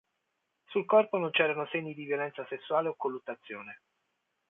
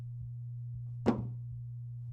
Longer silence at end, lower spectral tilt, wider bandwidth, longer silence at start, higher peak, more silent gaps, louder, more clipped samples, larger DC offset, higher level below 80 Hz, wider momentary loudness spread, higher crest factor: first, 0.75 s vs 0 s; second, -8 dB/octave vs -9.5 dB/octave; second, 3.9 kHz vs 7.6 kHz; first, 0.7 s vs 0 s; about the same, -12 dBFS vs -12 dBFS; neither; first, -30 LUFS vs -39 LUFS; neither; neither; second, -84 dBFS vs -58 dBFS; first, 16 LU vs 10 LU; second, 20 dB vs 26 dB